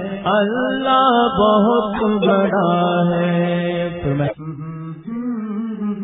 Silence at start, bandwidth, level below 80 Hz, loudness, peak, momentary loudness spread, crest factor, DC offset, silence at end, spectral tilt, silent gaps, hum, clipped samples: 0 s; 4 kHz; -48 dBFS; -17 LUFS; -2 dBFS; 13 LU; 16 dB; under 0.1%; 0 s; -12 dB/octave; none; none; under 0.1%